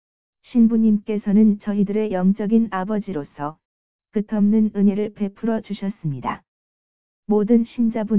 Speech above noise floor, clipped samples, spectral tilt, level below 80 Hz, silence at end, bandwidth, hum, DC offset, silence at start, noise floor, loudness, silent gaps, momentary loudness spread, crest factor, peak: over 71 dB; under 0.1%; -12.5 dB/octave; -58 dBFS; 0 s; 4 kHz; none; 0.9%; 0.45 s; under -90 dBFS; -20 LUFS; 3.65-3.99 s, 6.48-7.23 s; 12 LU; 14 dB; -6 dBFS